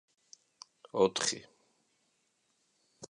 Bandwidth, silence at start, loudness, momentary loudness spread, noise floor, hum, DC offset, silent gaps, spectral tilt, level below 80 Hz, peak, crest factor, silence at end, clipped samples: 10.5 kHz; 0.95 s; -32 LUFS; 25 LU; -76 dBFS; none; under 0.1%; none; -2.5 dB/octave; -76 dBFS; -14 dBFS; 24 dB; 0.05 s; under 0.1%